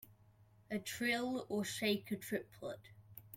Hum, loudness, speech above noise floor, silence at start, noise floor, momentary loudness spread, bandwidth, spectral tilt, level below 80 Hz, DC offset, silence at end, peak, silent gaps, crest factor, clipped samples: none; -40 LUFS; 27 dB; 0 s; -67 dBFS; 15 LU; 16.5 kHz; -4 dB/octave; -76 dBFS; under 0.1%; 0 s; -22 dBFS; none; 20 dB; under 0.1%